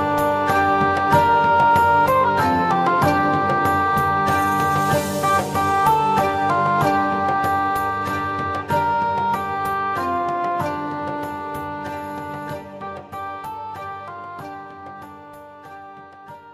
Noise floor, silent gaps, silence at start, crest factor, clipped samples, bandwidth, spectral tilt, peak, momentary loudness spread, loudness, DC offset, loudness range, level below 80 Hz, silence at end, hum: -41 dBFS; none; 0 s; 16 dB; under 0.1%; 15.5 kHz; -5.5 dB/octave; -4 dBFS; 18 LU; -19 LUFS; under 0.1%; 15 LU; -50 dBFS; 0 s; none